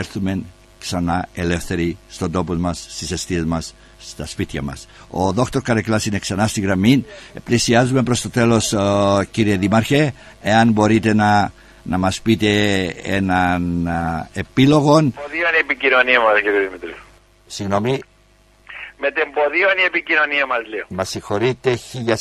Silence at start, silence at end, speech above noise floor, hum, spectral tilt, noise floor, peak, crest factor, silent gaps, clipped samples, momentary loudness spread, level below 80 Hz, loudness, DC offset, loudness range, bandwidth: 0 s; 0 s; 35 dB; none; -5 dB/octave; -53 dBFS; 0 dBFS; 18 dB; none; under 0.1%; 13 LU; -40 dBFS; -18 LUFS; under 0.1%; 7 LU; 14 kHz